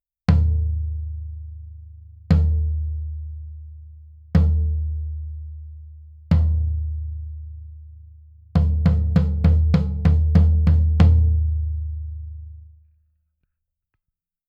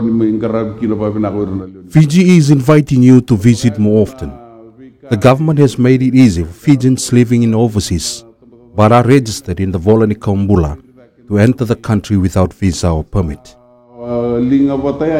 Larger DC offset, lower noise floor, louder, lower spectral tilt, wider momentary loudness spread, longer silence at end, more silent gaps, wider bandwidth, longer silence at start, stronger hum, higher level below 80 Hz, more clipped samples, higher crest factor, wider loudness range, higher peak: neither; first, -82 dBFS vs -41 dBFS; second, -21 LUFS vs -12 LUFS; first, -10 dB/octave vs -7 dB/octave; first, 22 LU vs 12 LU; first, 1.8 s vs 0 s; neither; second, 5.2 kHz vs 15.5 kHz; first, 0.3 s vs 0 s; neither; first, -24 dBFS vs -34 dBFS; second, under 0.1% vs 0.9%; first, 18 dB vs 12 dB; first, 8 LU vs 5 LU; second, -4 dBFS vs 0 dBFS